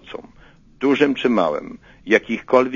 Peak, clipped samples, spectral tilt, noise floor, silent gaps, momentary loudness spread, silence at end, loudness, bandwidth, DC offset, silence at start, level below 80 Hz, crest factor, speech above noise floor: 0 dBFS; under 0.1%; -5.5 dB/octave; -49 dBFS; none; 20 LU; 0 s; -19 LUFS; 7.4 kHz; under 0.1%; 0.05 s; -54 dBFS; 20 dB; 31 dB